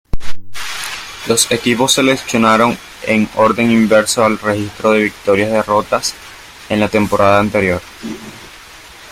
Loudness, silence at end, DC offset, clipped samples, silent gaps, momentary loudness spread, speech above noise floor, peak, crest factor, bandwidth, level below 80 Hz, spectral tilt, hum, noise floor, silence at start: -14 LUFS; 0 s; under 0.1%; under 0.1%; none; 18 LU; 24 dB; 0 dBFS; 14 dB; 16 kHz; -36 dBFS; -4 dB/octave; none; -37 dBFS; 0.15 s